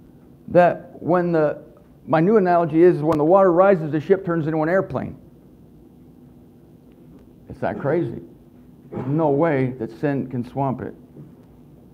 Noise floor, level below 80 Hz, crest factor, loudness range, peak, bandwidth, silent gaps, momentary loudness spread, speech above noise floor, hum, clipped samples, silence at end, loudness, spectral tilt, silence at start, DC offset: -48 dBFS; -54 dBFS; 18 dB; 13 LU; -2 dBFS; 6.6 kHz; none; 14 LU; 29 dB; none; under 0.1%; 0.7 s; -20 LUFS; -9.5 dB/octave; 0.5 s; under 0.1%